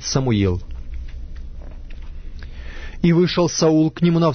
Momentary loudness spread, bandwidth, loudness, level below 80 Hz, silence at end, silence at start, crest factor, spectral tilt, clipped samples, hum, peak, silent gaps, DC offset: 22 LU; 6.6 kHz; -18 LUFS; -32 dBFS; 0 s; 0 s; 14 dB; -6 dB/octave; under 0.1%; none; -6 dBFS; none; under 0.1%